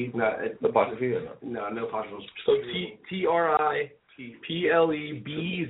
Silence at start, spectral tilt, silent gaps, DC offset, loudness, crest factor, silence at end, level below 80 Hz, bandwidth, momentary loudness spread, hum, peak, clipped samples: 0 s; -3.5 dB/octave; none; under 0.1%; -27 LUFS; 20 dB; 0 s; -66 dBFS; 4 kHz; 13 LU; none; -8 dBFS; under 0.1%